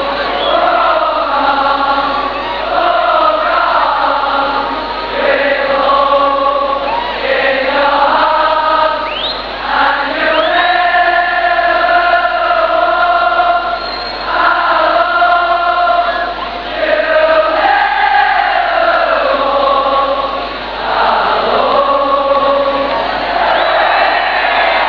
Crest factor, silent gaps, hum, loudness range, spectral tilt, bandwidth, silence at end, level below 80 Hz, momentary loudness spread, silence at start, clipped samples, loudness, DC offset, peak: 12 dB; none; none; 2 LU; -5 dB/octave; 5.4 kHz; 0 s; -38 dBFS; 6 LU; 0 s; under 0.1%; -11 LUFS; 0.2%; 0 dBFS